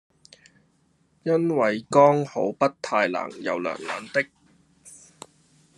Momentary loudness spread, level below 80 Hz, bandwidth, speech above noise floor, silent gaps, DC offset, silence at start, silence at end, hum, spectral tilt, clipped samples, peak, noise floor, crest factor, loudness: 13 LU; -72 dBFS; 11.5 kHz; 42 dB; none; under 0.1%; 1.25 s; 0.8 s; none; -6 dB/octave; under 0.1%; -4 dBFS; -65 dBFS; 22 dB; -24 LUFS